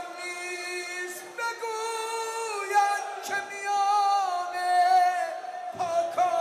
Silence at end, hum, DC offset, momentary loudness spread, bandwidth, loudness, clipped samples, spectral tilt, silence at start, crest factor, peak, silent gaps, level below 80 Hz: 0 s; none; under 0.1%; 11 LU; 15.5 kHz; -27 LUFS; under 0.1%; -1 dB/octave; 0 s; 14 dB; -14 dBFS; none; -80 dBFS